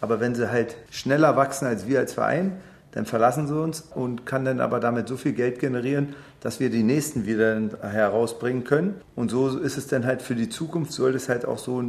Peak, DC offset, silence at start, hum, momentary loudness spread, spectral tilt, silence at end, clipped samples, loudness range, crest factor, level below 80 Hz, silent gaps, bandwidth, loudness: -4 dBFS; under 0.1%; 0 s; none; 8 LU; -6 dB/octave; 0 s; under 0.1%; 2 LU; 20 dB; -60 dBFS; none; 14 kHz; -25 LUFS